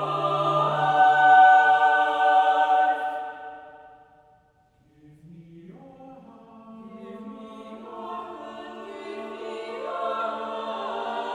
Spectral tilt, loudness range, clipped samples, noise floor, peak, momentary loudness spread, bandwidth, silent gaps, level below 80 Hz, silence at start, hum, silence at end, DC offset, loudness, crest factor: -5 dB/octave; 24 LU; under 0.1%; -62 dBFS; -6 dBFS; 25 LU; 8.2 kHz; none; -72 dBFS; 0 s; none; 0 s; under 0.1%; -21 LUFS; 18 dB